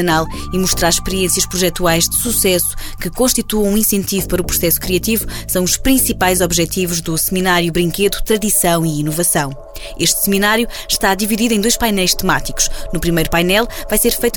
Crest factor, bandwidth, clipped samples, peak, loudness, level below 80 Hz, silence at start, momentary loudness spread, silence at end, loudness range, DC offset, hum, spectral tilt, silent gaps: 14 dB; over 20 kHz; under 0.1%; -2 dBFS; -15 LUFS; -28 dBFS; 0 s; 5 LU; 0 s; 1 LU; 0.2%; none; -3 dB/octave; none